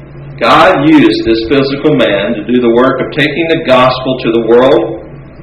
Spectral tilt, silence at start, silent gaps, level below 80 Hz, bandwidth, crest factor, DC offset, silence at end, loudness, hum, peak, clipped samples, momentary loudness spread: -6.5 dB/octave; 0 s; none; -36 dBFS; 10 kHz; 8 dB; under 0.1%; 0 s; -9 LUFS; none; 0 dBFS; 2%; 7 LU